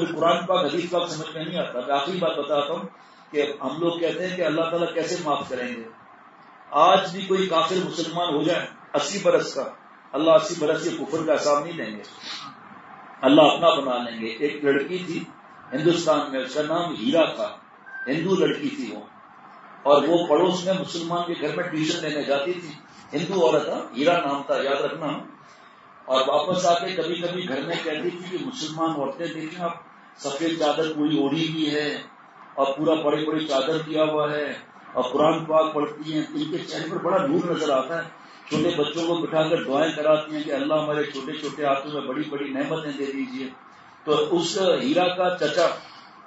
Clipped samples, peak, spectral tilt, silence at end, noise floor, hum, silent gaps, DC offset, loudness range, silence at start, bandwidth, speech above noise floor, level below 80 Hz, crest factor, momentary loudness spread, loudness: under 0.1%; -2 dBFS; -4.5 dB/octave; 0 s; -49 dBFS; none; none; under 0.1%; 4 LU; 0 s; 8 kHz; 26 dB; -74 dBFS; 22 dB; 12 LU; -24 LUFS